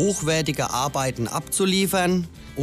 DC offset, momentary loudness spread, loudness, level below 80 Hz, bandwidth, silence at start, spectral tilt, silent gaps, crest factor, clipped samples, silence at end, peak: under 0.1%; 6 LU; -23 LUFS; -46 dBFS; 15.5 kHz; 0 s; -4 dB/octave; none; 14 dB; under 0.1%; 0 s; -10 dBFS